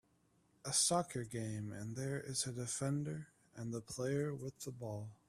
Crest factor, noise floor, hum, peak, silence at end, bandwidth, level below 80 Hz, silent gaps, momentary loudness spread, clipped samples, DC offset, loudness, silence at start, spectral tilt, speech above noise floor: 20 dB; -75 dBFS; none; -20 dBFS; 0.15 s; 15 kHz; -72 dBFS; none; 14 LU; under 0.1%; under 0.1%; -40 LUFS; 0.65 s; -4 dB/octave; 34 dB